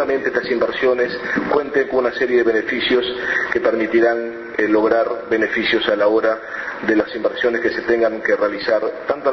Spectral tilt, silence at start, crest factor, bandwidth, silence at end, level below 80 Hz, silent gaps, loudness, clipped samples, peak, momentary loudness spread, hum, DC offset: -5.5 dB/octave; 0 s; 18 dB; 6.2 kHz; 0 s; -52 dBFS; none; -18 LUFS; under 0.1%; 0 dBFS; 5 LU; none; under 0.1%